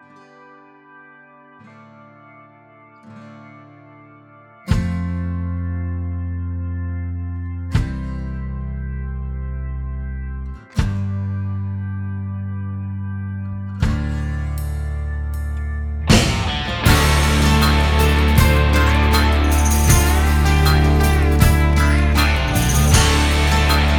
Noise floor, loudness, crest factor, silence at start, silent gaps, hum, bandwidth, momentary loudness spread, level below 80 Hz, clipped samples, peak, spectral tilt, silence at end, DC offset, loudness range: -47 dBFS; -19 LUFS; 18 dB; 3.05 s; none; none; 19.5 kHz; 13 LU; -22 dBFS; under 0.1%; 0 dBFS; -5 dB/octave; 0 s; under 0.1%; 11 LU